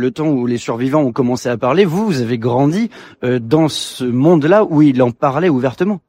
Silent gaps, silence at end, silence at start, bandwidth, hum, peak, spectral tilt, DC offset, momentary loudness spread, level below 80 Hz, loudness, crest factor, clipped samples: none; 0.1 s; 0 s; 16 kHz; none; 0 dBFS; -7 dB/octave; under 0.1%; 8 LU; -54 dBFS; -15 LUFS; 14 dB; under 0.1%